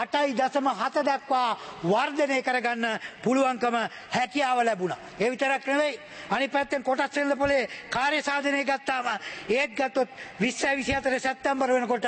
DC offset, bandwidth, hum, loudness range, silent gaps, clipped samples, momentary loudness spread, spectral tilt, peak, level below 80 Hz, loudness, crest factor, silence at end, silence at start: under 0.1%; 8.8 kHz; none; 1 LU; none; under 0.1%; 5 LU; -4 dB/octave; -10 dBFS; -58 dBFS; -26 LUFS; 16 dB; 0 s; 0 s